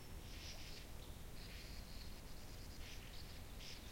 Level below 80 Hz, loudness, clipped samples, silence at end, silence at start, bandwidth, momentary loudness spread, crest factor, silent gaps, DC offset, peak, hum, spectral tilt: -56 dBFS; -54 LUFS; under 0.1%; 0 s; 0 s; 16.5 kHz; 3 LU; 14 dB; none; under 0.1%; -38 dBFS; none; -3.5 dB/octave